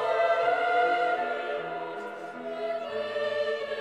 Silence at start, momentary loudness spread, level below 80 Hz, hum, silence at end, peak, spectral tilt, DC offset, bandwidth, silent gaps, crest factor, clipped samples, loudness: 0 s; 12 LU; -76 dBFS; none; 0 s; -14 dBFS; -4 dB/octave; under 0.1%; 9.4 kHz; none; 16 dB; under 0.1%; -29 LUFS